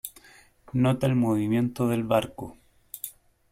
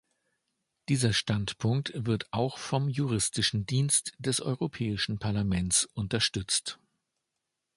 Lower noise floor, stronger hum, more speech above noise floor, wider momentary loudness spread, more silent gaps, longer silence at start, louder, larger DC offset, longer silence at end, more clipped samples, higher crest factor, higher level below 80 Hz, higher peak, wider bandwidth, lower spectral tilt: second, -55 dBFS vs -84 dBFS; neither; second, 31 dB vs 55 dB; first, 17 LU vs 6 LU; neither; second, 0.05 s vs 0.9 s; first, -25 LUFS vs -29 LUFS; neither; second, 0.4 s vs 1 s; neither; about the same, 18 dB vs 20 dB; about the same, -56 dBFS vs -52 dBFS; first, -8 dBFS vs -12 dBFS; first, 16.5 kHz vs 11.5 kHz; first, -7 dB/octave vs -4 dB/octave